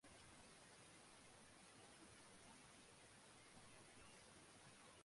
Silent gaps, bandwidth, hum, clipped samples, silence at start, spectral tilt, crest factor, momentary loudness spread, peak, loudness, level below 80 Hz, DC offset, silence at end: none; 11.5 kHz; none; under 0.1%; 0 s; -2.5 dB/octave; 16 dB; 1 LU; -50 dBFS; -65 LUFS; -82 dBFS; under 0.1%; 0 s